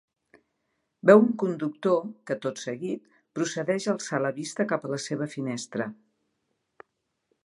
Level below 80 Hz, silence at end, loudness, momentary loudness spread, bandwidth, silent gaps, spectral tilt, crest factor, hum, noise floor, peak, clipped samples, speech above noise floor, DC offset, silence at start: -80 dBFS; 1.5 s; -27 LUFS; 15 LU; 11.5 kHz; none; -5.5 dB/octave; 24 dB; none; -78 dBFS; -4 dBFS; under 0.1%; 52 dB; under 0.1%; 1.05 s